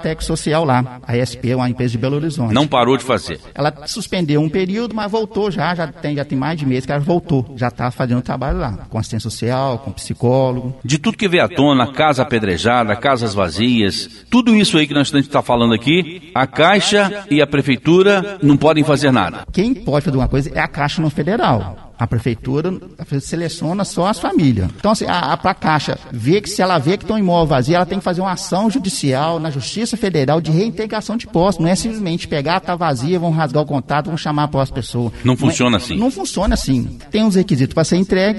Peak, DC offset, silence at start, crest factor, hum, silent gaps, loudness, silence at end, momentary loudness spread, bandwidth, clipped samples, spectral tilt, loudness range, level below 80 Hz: 0 dBFS; under 0.1%; 0 s; 16 dB; none; none; -16 LUFS; 0 s; 8 LU; 11.5 kHz; under 0.1%; -5.5 dB/octave; 5 LU; -36 dBFS